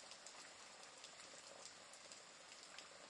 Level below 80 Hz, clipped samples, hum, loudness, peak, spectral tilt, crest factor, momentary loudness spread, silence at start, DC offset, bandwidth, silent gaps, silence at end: under -90 dBFS; under 0.1%; none; -57 LUFS; -36 dBFS; 0 dB/octave; 24 dB; 2 LU; 0 s; under 0.1%; 12 kHz; none; 0 s